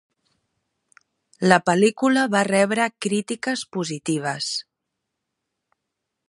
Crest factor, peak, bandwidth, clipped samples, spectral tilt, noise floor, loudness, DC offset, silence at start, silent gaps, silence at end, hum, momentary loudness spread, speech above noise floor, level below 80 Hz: 24 dB; 0 dBFS; 11.5 kHz; under 0.1%; -4.5 dB/octave; -81 dBFS; -21 LUFS; under 0.1%; 1.4 s; none; 1.65 s; none; 9 LU; 60 dB; -72 dBFS